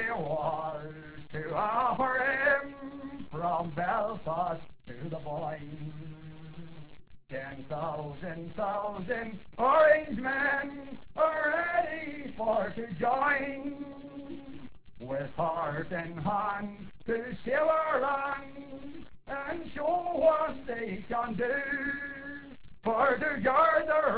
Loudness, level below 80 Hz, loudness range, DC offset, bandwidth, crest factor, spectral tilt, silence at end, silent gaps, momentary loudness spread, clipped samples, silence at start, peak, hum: -30 LUFS; -58 dBFS; 10 LU; 0.3%; 4 kHz; 20 dB; -4 dB/octave; 0 s; none; 18 LU; under 0.1%; 0 s; -12 dBFS; none